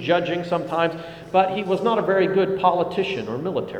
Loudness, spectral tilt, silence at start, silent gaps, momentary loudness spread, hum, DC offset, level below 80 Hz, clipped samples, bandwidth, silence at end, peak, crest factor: -22 LUFS; -7 dB/octave; 0 s; none; 7 LU; none; under 0.1%; -58 dBFS; under 0.1%; 9.6 kHz; 0 s; -4 dBFS; 18 dB